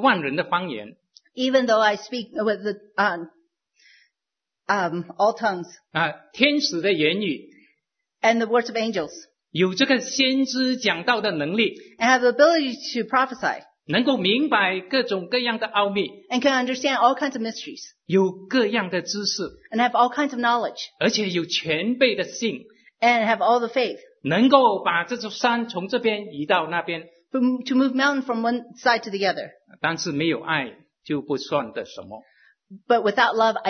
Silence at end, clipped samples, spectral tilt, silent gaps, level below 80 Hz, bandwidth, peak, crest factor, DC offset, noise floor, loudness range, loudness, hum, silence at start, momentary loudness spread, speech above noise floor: 0 s; under 0.1%; -4 dB/octave; none; -70 dBFS; 6.6 kHz; 0 dBFS; 22 dB; under 0.1%; -87 dBFS; 5 LU; -22 LUFS; none; 0 s; 11 LU; 65 dB